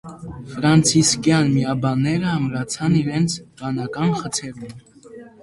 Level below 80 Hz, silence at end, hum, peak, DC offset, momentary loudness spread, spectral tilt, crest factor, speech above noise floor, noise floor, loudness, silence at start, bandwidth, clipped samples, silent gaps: -50 dBFS; 0.15 s; none; -2 dBFS; under 0.1%; 18 LU; -5 dB/octave; 18 dB; 22 dB; -42 dBFS; -19 LUFS; 0.05 s; 11.5 kHz; under 0.1%; none